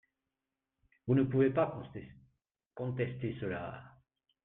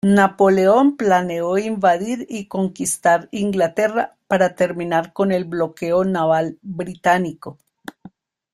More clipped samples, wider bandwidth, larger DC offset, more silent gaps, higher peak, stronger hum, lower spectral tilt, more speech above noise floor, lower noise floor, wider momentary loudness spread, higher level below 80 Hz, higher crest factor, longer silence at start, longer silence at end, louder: neither; second, 3.9 kHz vs 14 kHz; neither; neither; second, -18 dBFS vs -2 dBFS; neither; first, -11.5 dB/octave vs -5.5 dB/octave; first, 57 dB vs 28 dB; first, -90 dBFS vs -46 dBFS; first, 19 LU vs 13 LU; second, -66 dBFS vs -58 dBFS; about the same, 18 dB vs 18 dB; first, 1.05 s vs 0.05 s; about the same, 0.55 s vs 0.45 s; second, -34 LUFS vs -19 LUFS